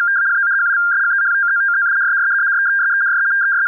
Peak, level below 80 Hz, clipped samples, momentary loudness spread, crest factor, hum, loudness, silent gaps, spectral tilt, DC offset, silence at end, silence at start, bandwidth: -12 dBFS; under -90 dBFS; under 0.1%; 0 LU; 4 dB; none; -14 LUFS; none; 4.5 dB/octave; under 0.1%; 0 s; 0 s; 2.1 kHz